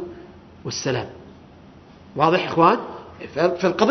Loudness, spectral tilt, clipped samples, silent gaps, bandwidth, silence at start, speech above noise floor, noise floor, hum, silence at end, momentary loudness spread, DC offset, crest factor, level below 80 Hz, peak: -21 LUFS; -5 dB/octave; under 0.1%; none; 6.4 kHz; 0 s; 26 dB; -46 dBFS; none; 0 s; 20 LU; under 0.1%; 22 dB; -56 dBFS; -2 dBFS